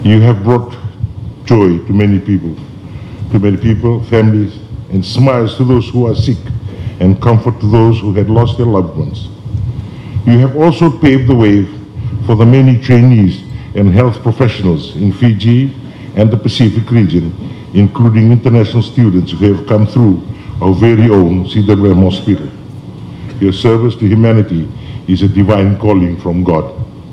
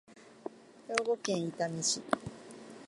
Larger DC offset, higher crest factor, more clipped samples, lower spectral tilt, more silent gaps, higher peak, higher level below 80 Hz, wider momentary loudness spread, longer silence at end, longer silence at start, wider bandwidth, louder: neither; second, 10 dB vs 28 dB; first, 2% vs under 0.1%; first, -9 dB/octave vs -3 dB/octave; neither; first, 0 dBFS vs -10 dBFS; first, -34 dBFS vs -70 dBFS; second, 15 LU vs 18 LU; about the same, 0 s vs 0 s; about the same, 0 s vs 0.1 s; second, 6.4 kHz vs 11.5 kHz; first, -10 LUFS vs -33 LUFS